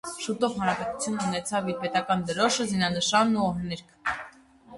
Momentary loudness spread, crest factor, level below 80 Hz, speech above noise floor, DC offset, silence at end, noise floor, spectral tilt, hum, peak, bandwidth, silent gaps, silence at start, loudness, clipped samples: 10 LU; 18 dB; -58 dBFS; 24 dB; under 0.1%; 0 s; -51 dBFS; -4 dB/octave; none; -8 dBFS; 11.5 kHz; none; 0.05 s; -27 LUFS; under 0.1%